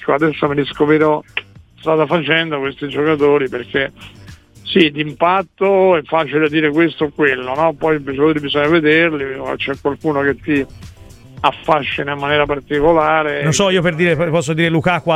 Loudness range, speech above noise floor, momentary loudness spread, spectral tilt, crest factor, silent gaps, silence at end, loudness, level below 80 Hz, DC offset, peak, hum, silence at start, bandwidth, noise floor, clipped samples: 3 LU; 24 dB; 7 LU; -5.5 dB/octave; 16 dB; none; 0 s; -15 LUFS; -44 dBFS; under 0.1%; 0 dBFS; none; 0 s; 12.5 kHz; -39 dBFS; under 0.1%